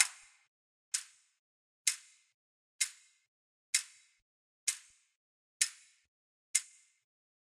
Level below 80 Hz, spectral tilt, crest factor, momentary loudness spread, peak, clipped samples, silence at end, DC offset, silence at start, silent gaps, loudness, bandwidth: under -90 dBFS; 8.5 dB/octave; 34 dB; 15 LU; -8 dBFS; under 0.1%; 0.85 s; under 0.1%; 0 s; 0.47-0.92 s, 1.39-1.85 s, 2.34-2.79 s, 3.28-3.73 s, 4.22-4.67 s, 5.16-5.60 s, 6.08-6.54 s; -35 LUFS; 16 kHz